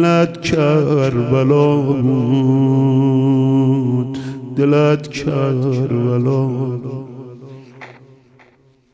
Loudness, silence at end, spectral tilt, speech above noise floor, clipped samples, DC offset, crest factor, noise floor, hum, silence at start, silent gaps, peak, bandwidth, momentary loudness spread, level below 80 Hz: -16 LUFS; 1 s; -8 dB/octave; 38 dB; under 0.1%; under 0.1%; 14 dB; -52 dBFS; none; 0 s; none; -2 dBFS; 8 kHz; 13 LU; -50 dBFS